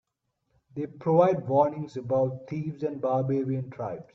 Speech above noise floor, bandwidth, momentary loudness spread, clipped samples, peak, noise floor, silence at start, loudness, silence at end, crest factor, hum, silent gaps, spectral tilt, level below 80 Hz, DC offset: 52 dB; 7 kHz; 14 LU; under 0.1%; -8 dBFS; -78 dBFS; 0.75 s; -27 LUFS; 0.15 s; 20 dB; none; none; -9.5 dB/octave; -68 dBFS; under 0.1%